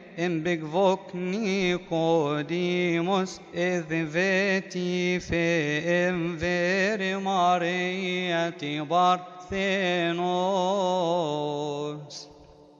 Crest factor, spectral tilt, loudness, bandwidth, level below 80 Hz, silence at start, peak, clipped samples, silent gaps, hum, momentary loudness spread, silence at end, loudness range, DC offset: 16 dB; -5.5 dB/octave; -26 LUFS; 7.8 kHz; -58 dBFS; 0 s; -10 dBFS; under 0.1%; none; none; 7 LU; 0.35 s; 1 LU; under 0.1%